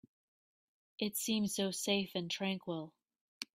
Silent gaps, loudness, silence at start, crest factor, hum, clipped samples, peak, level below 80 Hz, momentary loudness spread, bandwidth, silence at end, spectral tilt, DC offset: 3.21-3.41 s; -37 LUFS; 1 s; 20 dB; none; under 0.1%; -18 dBFS; -78 dBFS; 10 LU; 16 kHz; 0.1 s; -3.5 dB/octave; under 0.1%